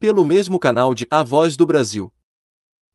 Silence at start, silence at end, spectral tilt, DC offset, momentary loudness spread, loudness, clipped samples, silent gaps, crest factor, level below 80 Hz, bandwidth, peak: 0 s; 0.85 s; -5.5 dB/octave; under 0.1%; 8 LU; -16 LUFS; under 0.1%; none; 16 dB; -62 dBFS; 12 kHz; -2 dBFS